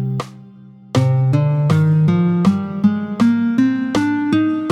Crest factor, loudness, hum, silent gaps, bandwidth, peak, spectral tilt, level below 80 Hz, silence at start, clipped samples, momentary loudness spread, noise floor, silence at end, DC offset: 12 dB; -16 LUFS; none; none; 10.5 kHz; -4 dBFS; -8 dB/octave; -52 dBFS; 0 s; under 0.1%; 4 LU; -41 dBFS; 0 s; under 0.1%